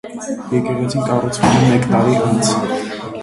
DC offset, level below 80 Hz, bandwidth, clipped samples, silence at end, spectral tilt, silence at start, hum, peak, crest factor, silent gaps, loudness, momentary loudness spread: under 0.1%; -44 dBFS; 11.5 kHz; under 0.1%; 0 s; -5.5 dB/octave; 0.05 s; none; 0 dBFS; 16 dB; none; -16 LUFS; 10 LU